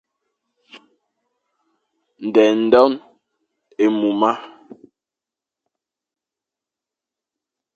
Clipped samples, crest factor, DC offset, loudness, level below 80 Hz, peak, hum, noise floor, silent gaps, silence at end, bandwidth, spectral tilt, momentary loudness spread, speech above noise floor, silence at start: under 0.1%; 22 dB; under 0.1%; -17 LUFS; -66 dBFS; 0 dBFS; none; -88 dBFS; none; 3.3 s; 7.4 kHz; -6 dB/octave; 17 LU; 73 dB; 0.75 s